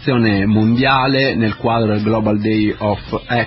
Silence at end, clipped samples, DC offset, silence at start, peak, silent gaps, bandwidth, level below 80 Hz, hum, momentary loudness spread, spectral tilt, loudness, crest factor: 0 s; under 0.1%; under 0.1%; 0 s; -2 dBFS; none; 5.8 kHz; -38 dBFS; none; 7 LU; -11.5 dB/octave; -15 LUFS; 14 dB